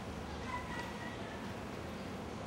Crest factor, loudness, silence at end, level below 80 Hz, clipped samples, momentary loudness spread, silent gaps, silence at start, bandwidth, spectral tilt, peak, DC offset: 14 dB; -43 LUFS; 0 s; -54 dBFS; under 0.1%; 3 LU; none; 0 s; 16 kHz; -5.5 dB/octave; -28 dBFS; under 0.1%